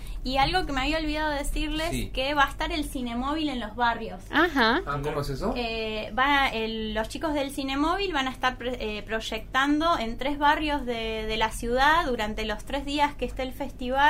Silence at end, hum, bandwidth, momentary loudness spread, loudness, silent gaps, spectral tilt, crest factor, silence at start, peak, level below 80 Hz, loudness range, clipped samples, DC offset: 0 s; none; 16 kHz; 8 LU; -27 LUFS; none; -4 dB/octave; 18 dB; 0 s; -8 dBFS; -38 dBFS; 2 LU; under 0.1%; under 0.1%